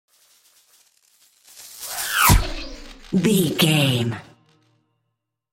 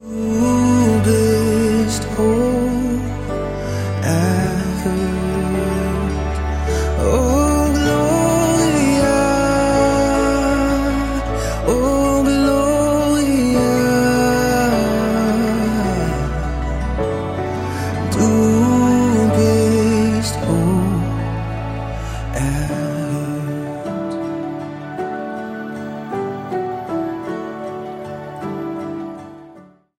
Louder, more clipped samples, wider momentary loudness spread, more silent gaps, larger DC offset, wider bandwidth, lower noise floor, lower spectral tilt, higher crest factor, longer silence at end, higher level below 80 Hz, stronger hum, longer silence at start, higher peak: about the same, -19 LUFS vs -18 LUFS; neither; first, 22 LU vs 12 LU; neither; neither; about the same, 17 kHz vs 16.5 kHz; first, -78 dBFS vs -44 dBFS; second, -4 dB/octave vs -6 dB/octave; first, 22 dB vs 14 dB; first, 1.3 s vs 0.35 s; about the same, -32 dBFS vs -28 dBFS; neither; first, 1.55 s vs 0 s; about the same, -2 dBFS vs -2 dBFS